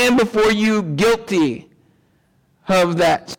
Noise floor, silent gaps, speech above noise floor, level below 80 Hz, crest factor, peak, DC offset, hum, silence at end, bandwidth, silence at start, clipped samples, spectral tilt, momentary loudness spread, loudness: -60 dBFS; none; 43 dB; -48 dBFS; 10 dB; -8 dBFS; under 0.1%; none; 0.05 s; 18.5 kHz; 0 s; under 0.1%; -5 dB/octave; 6 LU; -17 LUFS